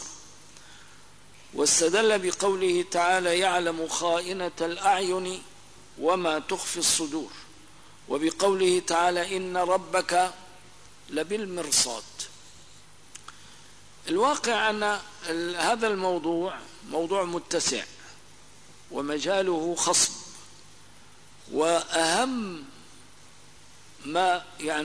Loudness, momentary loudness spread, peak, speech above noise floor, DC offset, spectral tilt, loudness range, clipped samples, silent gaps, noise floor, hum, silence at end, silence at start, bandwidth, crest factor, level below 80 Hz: -26 LUFS; 17 LU; -10 dBFS; 27 dB; 0.3%; -2 dB/octave; 5 LU; under 0.1%; none; -53 dBFS; 50 Hz at -60 dBFS; 0 s; 0 s; 11 kHz; 18 dB; -64 dBFS